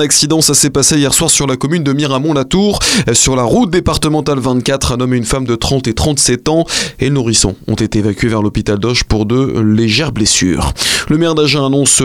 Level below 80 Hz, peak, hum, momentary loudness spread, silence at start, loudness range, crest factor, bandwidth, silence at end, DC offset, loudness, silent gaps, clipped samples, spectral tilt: -28 dBFS; 0 dBFS; none; 6 LU; 0 s; 3 LU; 10 dB; 17 kHz; 0 s; 0.3%; -11 LUFS; none; under 0.1%; -3.5 dB/octave